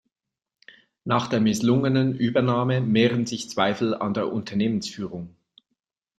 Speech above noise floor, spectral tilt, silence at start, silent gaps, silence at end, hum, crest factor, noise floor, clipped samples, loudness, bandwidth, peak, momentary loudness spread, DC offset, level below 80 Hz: 65 dB; -6 dB/octave; 1.05 s; none; 0.9 s; none; 20 dB; -88 dBFS; under 0.1%; -23 LUFS; 12.5 kHz; -4 dBFS; 12 LU; under 0.1%; -60 dBFS